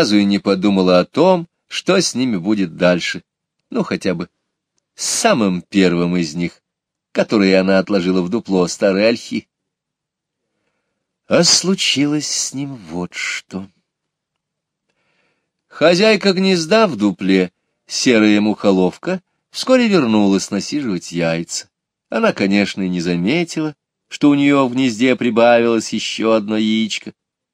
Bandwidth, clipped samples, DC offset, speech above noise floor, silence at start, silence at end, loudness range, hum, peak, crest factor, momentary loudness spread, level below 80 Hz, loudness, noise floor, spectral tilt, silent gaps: 14.5 kHz; under 0.1%; under 0.1%; 65 dB; 0 s; 0.4 s; 5 LU; none; 0 dBFS; 16 dB; 12 LU; -60 dBFS; -16 LUFS; -81 dBFS; -4.5 dB/octave; none